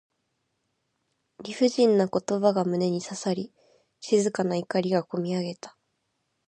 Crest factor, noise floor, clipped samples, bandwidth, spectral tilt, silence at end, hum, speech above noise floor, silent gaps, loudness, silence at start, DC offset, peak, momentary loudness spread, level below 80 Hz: 20 dB; -77 dBFS; under 0.1%; 9.8 kHz; -5.5 dB/octave; 0.8 s; none; 52 dB; none; -26 LUFS; 1.4 s; under 0.1%; -8 dBFS; 19 LU; -74 dBFS